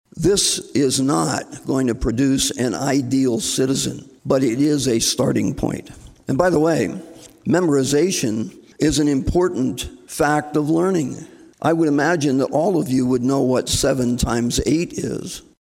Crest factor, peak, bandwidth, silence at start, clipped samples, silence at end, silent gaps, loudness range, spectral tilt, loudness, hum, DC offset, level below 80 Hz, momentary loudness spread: 16 dB; -2 dBFS; 16.5 kHz; 0.15 s; under 0.1%; 0.2 s; none; 1 LU; -4.5 dB/octave; -19 LUFS; none; under 0.1%; -38 dBFS; 9 LU